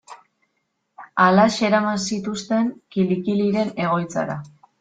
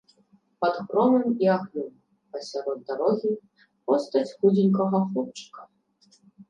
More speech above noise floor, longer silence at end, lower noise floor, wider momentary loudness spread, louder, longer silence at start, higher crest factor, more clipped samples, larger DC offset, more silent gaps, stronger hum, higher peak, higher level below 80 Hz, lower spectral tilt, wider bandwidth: first, 53 dB vs 38 dB; first, 0.3 s vs 0.05 s; first, -73 dBFS vs -63 dBFS; second, 11 LU vs 17 LU; first, -21 LUFS vs -25 LUFS; second, 0.1 s vs 0.6 s; about the same, 18 dB vs 16 dB; neither; neither; neither; neither; first, -2 dBFS vs -10 dBFS; first, -60 dBFS vs -78 dBFS; second, -5.5 dB/octave vs -7.5 dB/octave; about the same, 9.2 kHz vs 9 kHz